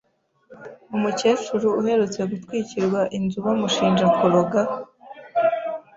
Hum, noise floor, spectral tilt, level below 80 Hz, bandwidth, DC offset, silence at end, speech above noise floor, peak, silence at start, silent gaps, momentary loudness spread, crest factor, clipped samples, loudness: none; -59 dBFS; -5.5 dB/octave; -60 dBFS; 8 kHz; under 0.1%; 0.15 s; 38 dB; -4 dBFS; 0.5 s; none; 10 LU; 18 dB; under 0.1%; -22 LUFS